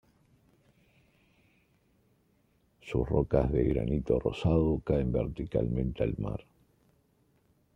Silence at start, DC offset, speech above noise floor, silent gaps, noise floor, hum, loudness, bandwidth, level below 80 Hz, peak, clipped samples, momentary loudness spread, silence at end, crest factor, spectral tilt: 2.85 s; under 0.1%; 41 dB; none; -70 dBFS; none; -30 LUFS; 8.8 kHz; -42 dBFS; -10 dBFS; under 0.1%; 8 LU; 1.35 s; 22 dB; -9.5 dB/octave